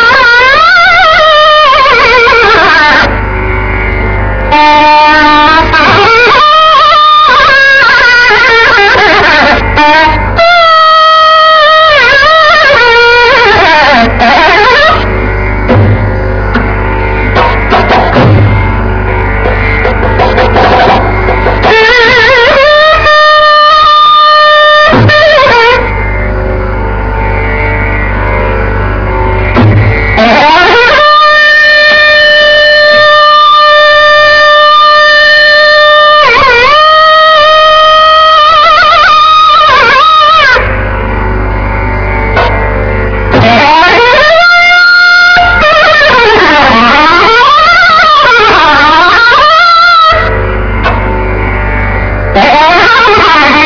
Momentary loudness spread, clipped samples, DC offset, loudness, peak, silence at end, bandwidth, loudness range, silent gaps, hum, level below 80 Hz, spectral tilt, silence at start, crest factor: 9 LU; 20%; under 0.1%; -3 LUFS; 0 dBFS; 0 s; 5.4 kHz; 6 LU; none; none; -18 dBFS; -5 dB/octave; 0 s; 4 dB